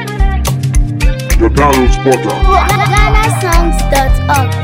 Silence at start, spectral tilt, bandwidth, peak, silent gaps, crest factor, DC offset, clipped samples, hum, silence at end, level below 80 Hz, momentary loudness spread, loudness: 0 s; -5.5 dB/octave; 16.5 kHz; 0 dBFS; none; 10 dB; under 0.1%; 0.5%; none; 0 s; -12 dBFS; 5 LU; -11 LUFS